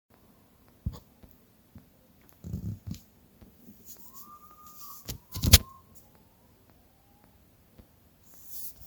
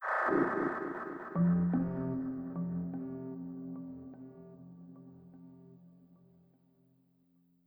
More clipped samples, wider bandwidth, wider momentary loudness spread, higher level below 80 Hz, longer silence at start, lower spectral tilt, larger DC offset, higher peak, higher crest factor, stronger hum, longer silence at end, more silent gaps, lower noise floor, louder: neither; first, over 20 kHz vs 3.6 kHz; first, 30 LU vs 25 LU; first, -42 dBFS vs -66 dBFS; first, 0.85 s vs 0 s; second, -3 dB/octave vs -10.5 dB/octave; neither; first, 0 dBFS vs -18 dBFS; first, 34 dB vs 20 dB; neither; second, 0 s vs 1.5 s; neither; second, -61 dBFS vs -70 dBFS; first, -28 LUFS vs -35 LUFS